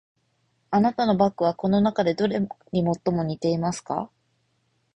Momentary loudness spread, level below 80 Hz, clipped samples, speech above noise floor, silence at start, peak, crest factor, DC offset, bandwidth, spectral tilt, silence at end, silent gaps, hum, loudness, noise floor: 8 LU; -58 dBFS; under 0.1%; 47 dB; 0.7 s; -8 dBFS; 18 dB; under 0.1%; 10 kHz; -7 dB/octave; 0.9 s; none; none; -24 LUFS; -70 dBFS